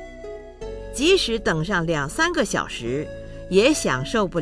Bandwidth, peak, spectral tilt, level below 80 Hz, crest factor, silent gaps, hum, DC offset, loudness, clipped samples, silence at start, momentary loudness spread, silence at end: 11 kHz; -4 dBFS; -4 dB/octave; -40 dBFS; 18 dB; none; none; under 0.1%; -21 LUFS; under 0.1%; 0 s; 18 LU; 0 s